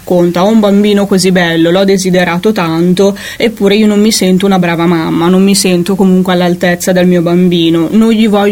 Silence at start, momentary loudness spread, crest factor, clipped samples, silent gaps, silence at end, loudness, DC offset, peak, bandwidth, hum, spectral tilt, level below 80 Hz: 0.05 s; 3 LU; 8 dB; 0.2%; none; 0 s; -8 LUFS; under 0.1%; 0 dBFS; 17 kHz; none; -5.5 dB/octave; -42 dBFS